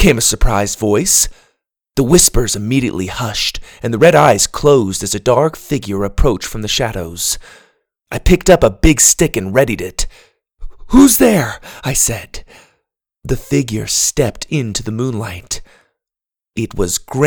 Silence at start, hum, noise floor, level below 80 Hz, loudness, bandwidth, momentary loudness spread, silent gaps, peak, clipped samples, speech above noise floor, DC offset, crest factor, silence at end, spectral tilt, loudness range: 0 s; none; -87 dBFS; -26 dBFS; -14 LUFS; over 20 kHz; 14 LU; none; 0 dBFS; 0.3%; 73 dB; under 0.1%; 14 dB; 0 s; -4 dB/octave; 6 LU